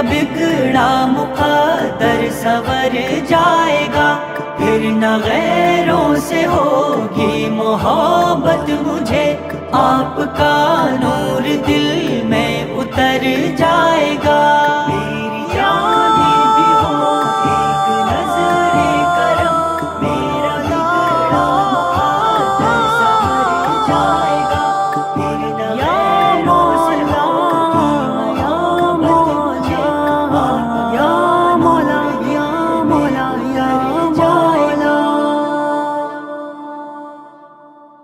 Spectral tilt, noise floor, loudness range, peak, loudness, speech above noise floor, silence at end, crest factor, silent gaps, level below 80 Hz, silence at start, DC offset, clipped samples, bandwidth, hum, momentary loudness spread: -5.5 dB/octave; -41 dBFS; 2 LU; -2 dBFS; -14 LUFS; 27 dB; 0.55 s; 12 dB; none; -40 dBFS; 0 s; under 0.1%; under 0.1%; 16 kHz; none; 6 LU